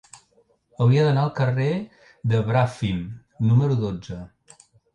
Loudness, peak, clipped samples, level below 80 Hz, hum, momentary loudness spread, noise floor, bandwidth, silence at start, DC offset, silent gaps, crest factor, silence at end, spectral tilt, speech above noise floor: -22 LUFS; -8 dBFS; under 0.1%; -50 dBFS; none; 16 LU; -62 dBFS; 9 kHz; 0.8 s; under 0.1%; none; 14 dB; 0.7 s; -8 dB/octave; 41 dB